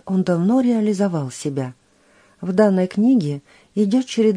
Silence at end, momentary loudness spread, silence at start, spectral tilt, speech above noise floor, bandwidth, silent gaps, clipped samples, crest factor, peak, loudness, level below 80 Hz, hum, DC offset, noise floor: 0 s; 12 LU; 0.05 s; -7 dB/octave; 37 dB; 10.5 kHz; none; under 0.1%; 16 dB; -4 dBFS; -19 LUFS; -66 dBFS; none; under 0.1%; -55 dBFS